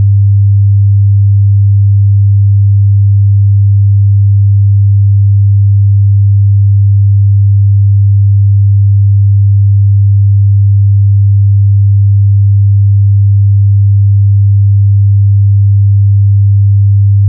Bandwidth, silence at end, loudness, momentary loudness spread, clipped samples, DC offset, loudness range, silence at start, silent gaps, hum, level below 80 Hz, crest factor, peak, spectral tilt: 0.2 kHz; 0 s; -7 LUFS; 0 LU; under 0.1%; under 0.1%; 0 LU; 0 s; none; none; -38 dBFS; 4 dB; -2 dBFS; -31.5 dB/octave